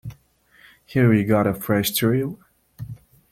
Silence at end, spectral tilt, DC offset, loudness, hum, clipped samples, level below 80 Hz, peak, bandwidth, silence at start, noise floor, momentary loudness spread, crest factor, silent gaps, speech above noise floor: 0.4 s; -6 dB/octave; under 0.1%; -20 LUFS; none; under 0.1%; -54 dBFS; -4 dBFS; 16.5 kHz; 0.05 s; -57 dBFS; 21 LU; 18 dB; none; 37 dB